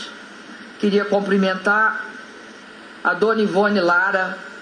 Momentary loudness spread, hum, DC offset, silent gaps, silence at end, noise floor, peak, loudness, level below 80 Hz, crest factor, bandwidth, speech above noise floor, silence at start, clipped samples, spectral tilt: 22 LU; none; under 0.1%; none; 0 s; -40 dBFS; -6 dBFS; -19 LUFS; -68 dBFS; 14 dB; 10 kHz; 22 dB; 0 s; under 0.1%; -6 dB/octave